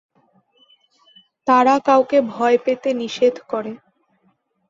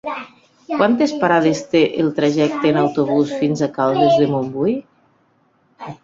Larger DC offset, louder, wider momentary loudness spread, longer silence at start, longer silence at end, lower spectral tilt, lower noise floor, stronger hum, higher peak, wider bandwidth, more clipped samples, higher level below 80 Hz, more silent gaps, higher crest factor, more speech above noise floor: neither; about the same, -18 LUFS vs -17 LUFS; about the same, 13 LU vs 12 LU; first, 1.45 s vs 0.05 s; first, 0.95 s vs 0.1 s; second, -4.5 dB/octave vs -6.5 dB/octave; first, -64 dBFS vs -59 dBFS; neither; about the same, -2 dBFS vs -2 dBFS; about the same, 7.6 kHz vs 7.8 kHz; neither; second, -68 dBFS vs -58 dBFS; neither; about the same, 18 dB vs 16 dB; first, 47 dB vs 43 dB